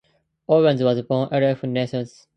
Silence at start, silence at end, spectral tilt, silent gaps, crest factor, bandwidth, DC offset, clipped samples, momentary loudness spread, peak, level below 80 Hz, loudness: 0.5 s; 0.3 s; -8 dB/octave; none; 16 dB; 8.8 kHz; under 0.1%; under 0.1%; 10 LU; -6 dBFS; -64 dBFS; -21 LUFS